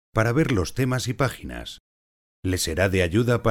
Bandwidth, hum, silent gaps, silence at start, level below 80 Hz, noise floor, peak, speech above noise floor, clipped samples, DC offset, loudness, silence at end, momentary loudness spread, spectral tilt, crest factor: 17 kHz; none; 1.80-2.43 s; 0.15 s; -42 dBFS; under -90 dBFS; -6 dBFS; over 67 dB; under 0.1%; under 0.1%; -23 LUFS; 0 s; 14 LU; -5.5 dB/octave; 18 dB